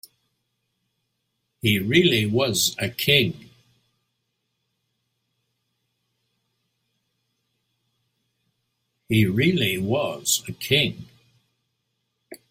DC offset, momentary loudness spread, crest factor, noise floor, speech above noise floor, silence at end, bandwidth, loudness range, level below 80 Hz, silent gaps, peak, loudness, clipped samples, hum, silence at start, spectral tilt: under 0.1%; 8 LU; 24 dB; -77 dBFS; 55 dB; 0.15 s; 16 kHz; 5 LU; -58 dBFS; none; -2 dBFS; -21 LUFS; under 0.1%; none; 1.65 s; -4 dB/octave